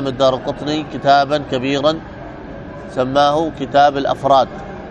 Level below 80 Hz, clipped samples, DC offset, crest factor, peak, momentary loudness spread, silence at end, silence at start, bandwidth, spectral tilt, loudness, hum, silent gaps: -42 dBFS; under 0.1%; under 0.1%; 16 dB; 0 dBFS; 18 LU; 0 s; 0 s; 9 kHz; -5.5 dB/octave; -16 LUFS; none; none